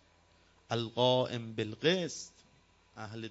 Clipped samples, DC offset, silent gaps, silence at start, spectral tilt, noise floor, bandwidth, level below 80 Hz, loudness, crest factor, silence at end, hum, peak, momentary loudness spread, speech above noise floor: under 0.1%; under 0.1%; none; 0.7 s; -4.5 dB/octave; -66 dBFS; 8 kHz; -72 dBFS; -33 LUFS; 22 dB; 0 s; none; -14 dBFS; 17 LU; 33 dB